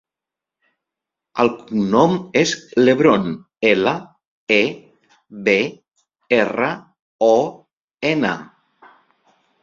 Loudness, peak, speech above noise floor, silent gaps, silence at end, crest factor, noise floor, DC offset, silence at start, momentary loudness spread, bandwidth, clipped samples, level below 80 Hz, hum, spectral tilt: -18 LUFS; 0 dBFS; 70 dB; 4.28-4.47 s, 7.02-7.19 s, 7.84-7.88 s; 1.2 s; 20 dB; -87 dBFS; under 0.1%; 1.35 s; 12 LU; 7.6 kHz; under 0.1%; -58 dBFS; none; -5 dB/octave